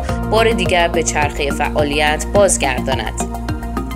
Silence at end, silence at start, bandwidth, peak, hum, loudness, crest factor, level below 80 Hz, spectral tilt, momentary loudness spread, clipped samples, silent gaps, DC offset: 0 s; 0 s; 16 kHz; 0 dBFS; none; -16 LUFS; 16 dB; -26 dBFS; -4 dB/octave; 9 LU; under 0.1%; none; under 0.1%